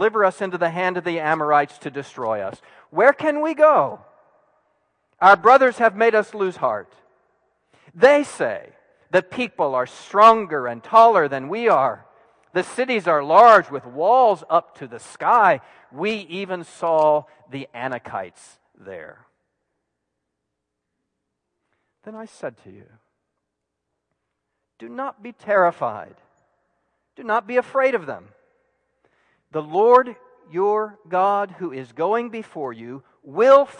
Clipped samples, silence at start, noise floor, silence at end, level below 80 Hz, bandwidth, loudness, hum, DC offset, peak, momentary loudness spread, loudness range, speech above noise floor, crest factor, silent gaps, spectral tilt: under 0.1%; 0 s; -80 dBFS; 0.1 s; -72 dBFS; 10.5 kHz; -18 LUFS; none; under 0.1%; -2 dBFS; 21 LU; 9 LU; 61 dB; 20 dB; none; -5 dB/octave